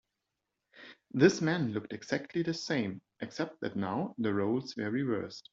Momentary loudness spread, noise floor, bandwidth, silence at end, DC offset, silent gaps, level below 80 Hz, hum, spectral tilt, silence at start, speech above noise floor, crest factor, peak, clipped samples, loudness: 13 LU; -86 dBFS; 7.8 kHz; 0.15 s; under 0.1%; none; -72 dBFS; none; -6 dB/octave; 0.75 s; 54 dB; 24 dB; -10 dBFS; under 0.1%; -33 LUFS